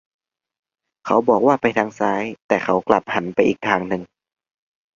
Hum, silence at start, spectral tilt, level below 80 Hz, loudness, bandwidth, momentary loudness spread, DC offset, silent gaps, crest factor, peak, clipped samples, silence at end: none; 1.05 s; -6 dB/octave; -58 dBFS; -19 LUFS; 7.4 kHz; 9 LU; under 0.1%; 2.42-2.49 s; 20 dB; 0 dBFS; under 0.1%; 0.9 s